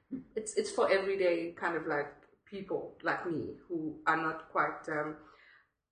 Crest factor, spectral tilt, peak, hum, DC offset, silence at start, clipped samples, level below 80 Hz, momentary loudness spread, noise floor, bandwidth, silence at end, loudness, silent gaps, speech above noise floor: 20 dB; -4.5 dB/octave; -14 dBFS; none; under 0.1%; 0.1 s; under 0.1%; -72 dBFS; 12 LU; -64 dBFS; 10 kHz; 0.6 s; -34 LUFS; none; 31 dB